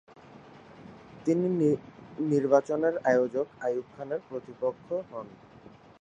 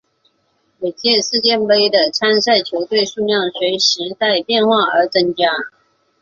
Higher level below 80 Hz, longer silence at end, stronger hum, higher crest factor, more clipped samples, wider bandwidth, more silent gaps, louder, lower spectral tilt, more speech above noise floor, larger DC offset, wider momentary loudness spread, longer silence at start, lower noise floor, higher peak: second, -70 dBFS vs -60 dBFS; about the same, 0.65 s vs 0.55 s; neither; first, 22 dB vs 16 dB; neither; first, 9 kHz vs 7.6 kHz; neither; second, -29 LUFS vs -15 LUFS; first, -8 dB/octave vs -2.5 dB/octave; second, 25 dB vs 48 dB; neither; first, 22 LU vs 6 LU; second, 0.3 s vs 0.8 s; second, -53 dBFS vs -63 dBFS; second, -8 dBFS vs 0 dBFS